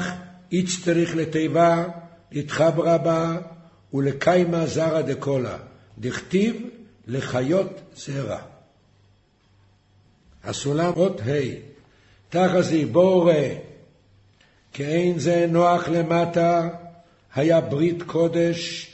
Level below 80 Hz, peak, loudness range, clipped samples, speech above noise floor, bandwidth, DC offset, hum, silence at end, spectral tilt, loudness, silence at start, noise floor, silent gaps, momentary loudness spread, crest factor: -58 dBFS; -4 dBFS; 7 LU; under 0.1%; 38 dB; 8.4 kHz; under 0.1%; none; 0.05 s; -6 dB/octave; -22 LUFS; 0 s; -60 dBFS; none; 14 LU; 18 dB